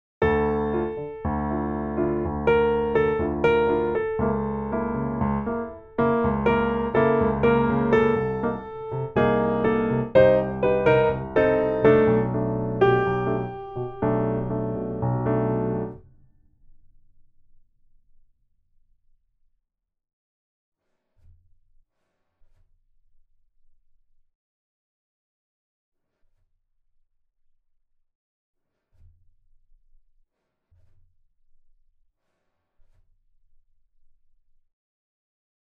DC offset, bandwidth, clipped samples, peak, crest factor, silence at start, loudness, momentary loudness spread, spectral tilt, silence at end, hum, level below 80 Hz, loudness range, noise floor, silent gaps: under 0.1%; 5.2 kHz; under 0.1%; -4 dBFS; 22 dB; 0.2 s; -23 LUFS; 10 LU; -9.5 dB/octave; 19.7 s; none; -44 dBFS; 8 LU; -74 dBFS; none